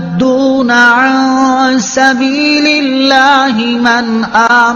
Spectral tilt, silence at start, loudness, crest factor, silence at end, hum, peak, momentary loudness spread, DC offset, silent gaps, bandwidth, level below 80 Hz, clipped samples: -3.5 dB/octave; 0 s; -8 LUFS; 8 dB; 0 s; none; 0 dBFS; 4 LU; under 0.1%; none; 7.4 kHz; -48 dBFS; 0.5%